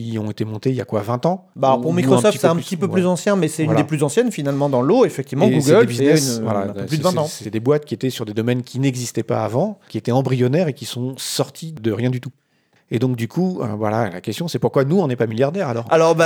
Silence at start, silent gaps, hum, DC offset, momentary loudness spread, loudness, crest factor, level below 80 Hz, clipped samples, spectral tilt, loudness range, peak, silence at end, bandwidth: 0 s; none; none; under 0.1%; 9 LU; -19 LUFS; 18 dB; -68 dBFS; under 0.1%; -6 dB/octave; 6 LU; 0 dBFS; 0 s; 19.5 kHz